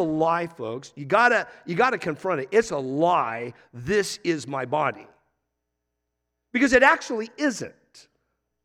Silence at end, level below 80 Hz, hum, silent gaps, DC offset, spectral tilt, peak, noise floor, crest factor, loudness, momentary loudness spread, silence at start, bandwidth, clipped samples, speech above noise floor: 0.95 s; -58 dBFS; 60 Hz at -60 dBFS; none; under 0.1%; -4.5 dB/octave; -4 dBFS; -80 dBFS; 22 dB; -23 LUFS; 15 LU; 0 s; 15 kHz; under 0.1%; 57 dB